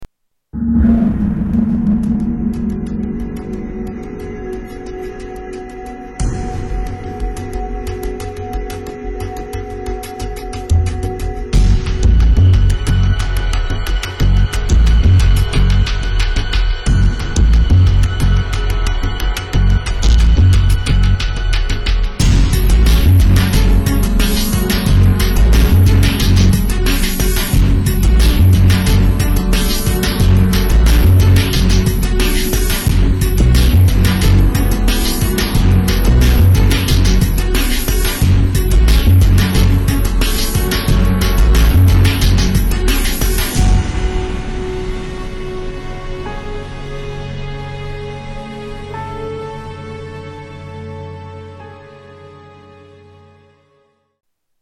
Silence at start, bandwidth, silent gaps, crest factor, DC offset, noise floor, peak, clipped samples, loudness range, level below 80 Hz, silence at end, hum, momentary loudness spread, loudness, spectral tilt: 0 s; 13 kHz; none; 10 dB; under 0.1%; -58 dBFS; -4 dBFS; under 0.1%; 13 LU; -16 dBFS; 2.3 s; none; 16 LU; -14 LUFS; -5.5 dB/octave